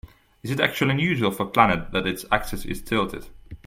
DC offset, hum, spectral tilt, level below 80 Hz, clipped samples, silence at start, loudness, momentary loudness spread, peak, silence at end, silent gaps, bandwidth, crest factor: under 0.1%; none; -5.5 dB/octave; -42 dBFS; under 0.1%; 0.05 s; -23 LUFS; 12 LU; -2 dBFS; 0.1 s; none; 16.5 kHz; 22 dB